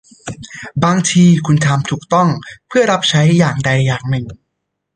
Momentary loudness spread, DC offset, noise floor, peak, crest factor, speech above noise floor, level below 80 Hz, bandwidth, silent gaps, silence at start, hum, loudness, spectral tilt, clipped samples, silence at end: 17 LU; under 0.1%; -74 dBFS; 0 dBFS; 14 dB; 61 dB; -48 dBFS; 9.8 kHz; none; 0.25 s; none; -13 LUFS; -5.5 dB/octave; under 0.1%; 0.6 s